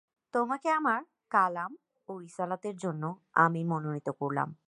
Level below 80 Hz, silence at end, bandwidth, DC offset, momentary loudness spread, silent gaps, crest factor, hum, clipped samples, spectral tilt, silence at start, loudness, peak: -82 dBFS; 0.15 s; 11 kHz; under 0.1%; 14 LU; none; 22 dB; none; under 0.1%; -7 dB/octave; 0.35 s; -31 LUFS; -10 dBFS